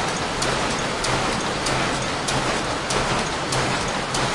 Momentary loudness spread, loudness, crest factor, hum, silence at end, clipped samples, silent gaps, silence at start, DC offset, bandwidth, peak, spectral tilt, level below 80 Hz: 2 LU; -22 LUFS; 16 dB; none; 0 s; under 0.1%; none; 0 s; under 0.1%; 11.5 kHz; -8 dBFS; -3 dB/octave; -38 dBFS